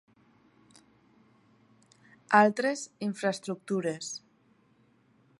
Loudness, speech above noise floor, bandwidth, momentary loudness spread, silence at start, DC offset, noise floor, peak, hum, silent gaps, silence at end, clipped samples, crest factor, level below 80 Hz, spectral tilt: -29 LUFS; 38 dB; 11.5 kHz; 15 LU; 2.3 s; under 0.1%; -66 dBFS; -8 dBFS; none; none; 1.2 s; under 0.1%; 26 dB; -82 dBFS; -4.5 dB/octave